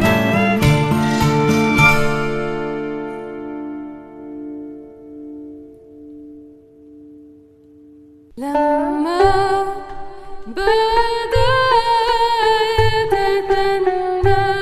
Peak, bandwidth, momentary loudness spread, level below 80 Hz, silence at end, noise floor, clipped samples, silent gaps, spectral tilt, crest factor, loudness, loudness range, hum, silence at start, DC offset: 0 dBFS; 14 kHz; 20 LU; -34 dBFS; 0 s; -46 dBFS; under 0.1%; none; -5.5 dB/octave; 18 dB; -16 LUFS; 20 LU; none; 0 s; under 0.1%